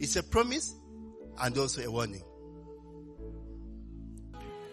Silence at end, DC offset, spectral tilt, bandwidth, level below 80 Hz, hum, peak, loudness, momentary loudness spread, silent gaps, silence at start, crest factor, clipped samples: 0 s; under 0.1%; -3.5 dB/octave; 13.5 kHz; -48 dBFS; none; -14 dBFS; -32 LUFS; 21 LU; none; 0 s; 22 dB; under 0.1%